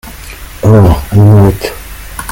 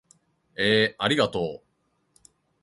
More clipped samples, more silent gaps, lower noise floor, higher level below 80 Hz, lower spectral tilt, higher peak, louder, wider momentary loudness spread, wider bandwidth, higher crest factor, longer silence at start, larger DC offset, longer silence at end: first, 2% vs under 0.1%; neither; second, -27 dBFS vs -71 dBFS; first, -24 dBFS vs -60 dBFS; first, -7.5 dB/octave vs -4.5 dB/octave; first, 0 dBFS vs -6 dBFS; first, -7 LUFS vs -24 LUFS; first, 21 LU vs 18 LU; first, 17 kHz vs 11.5 kHz; second, 8 dB vs 22 dB; second, 0.05 s vs 0.6 s; neither; second, 0 s vs 1.05 s